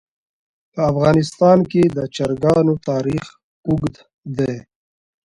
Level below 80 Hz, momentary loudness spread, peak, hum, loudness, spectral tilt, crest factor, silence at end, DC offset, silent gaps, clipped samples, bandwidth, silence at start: -46 dBFS; 15 LU; 0 dBFS; none; -18 LUFS; -7.5 dB/octave; 18 dB; 0.65 s; under 0.1%; 3.43-3.63 s, 4.14-4.22 s; under 0.1%; 11.5 kHz; 0.75 s